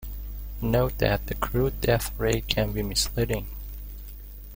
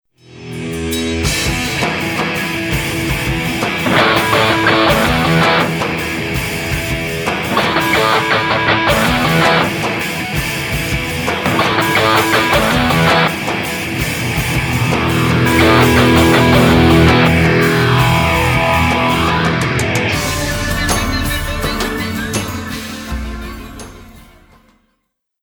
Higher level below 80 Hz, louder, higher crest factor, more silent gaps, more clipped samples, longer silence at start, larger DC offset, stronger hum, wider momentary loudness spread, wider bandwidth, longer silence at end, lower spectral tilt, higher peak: second, -34 dBFS vs -28 dBFS; second, -26 LUFS vs -13 LUFS; first, 24 dB vs 14 dB; neither; neither; second, 0 s vs 0.3 s; neither; first, 50 Hz at -35 dBFS vs none; first, 15 LU vs 9 LU; second, 17 kHz vs over 20 kHz; second, 0 s vs 1.2 s; about the same, -4.5 dB/octave vs -4.5 dB/octave; second, -4 dBFS vs 0 dBFS